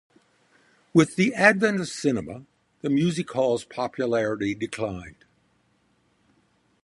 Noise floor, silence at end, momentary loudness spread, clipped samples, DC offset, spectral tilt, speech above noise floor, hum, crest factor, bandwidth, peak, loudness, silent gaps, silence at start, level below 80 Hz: -66 dBFS; 1.7 s; 13 LU; under 0.1%; under 0.1%; -5.5 dB/octave; 43 dB; none; 24 dB; 11.5 kHz; -2 dBFS; -24 LUFS; none; 0.95 s; -58 dBFS